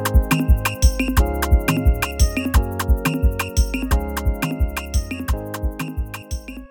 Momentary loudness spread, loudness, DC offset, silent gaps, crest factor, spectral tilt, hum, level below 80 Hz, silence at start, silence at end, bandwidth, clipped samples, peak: 10 LU; -21 LUFS; under 0.1%; none; 16 dB; -5.5 dB/octave; none; -20 dBFS; 0 s; 0.05 s; 18.5 kHz; under 0.1%; -4 dBFS